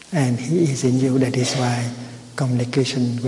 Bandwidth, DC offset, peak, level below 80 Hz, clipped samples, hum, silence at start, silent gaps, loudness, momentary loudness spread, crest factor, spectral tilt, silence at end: 11.5 kHz; under 0.1%; -6 dBFS; -58 dBFS; under 0.1%; none; 0.05 s; none; -20 LUFS; 8 LU; 14 dB; -6 dB/octave; 0 s